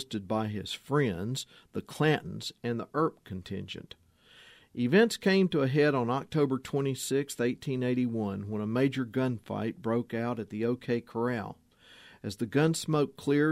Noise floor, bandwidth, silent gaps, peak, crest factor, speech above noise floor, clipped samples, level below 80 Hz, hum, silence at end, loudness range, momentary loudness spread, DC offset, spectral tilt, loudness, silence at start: -58 dBFS; 15.5 kHz; none; -10 dBFS; 20 dB; 28 dB; under 0.1%; -66 dBFS; none; 0 s; 6 LU; 13 LU; under 0.1%; -6 dB/octave; -30 LUFS; 0 s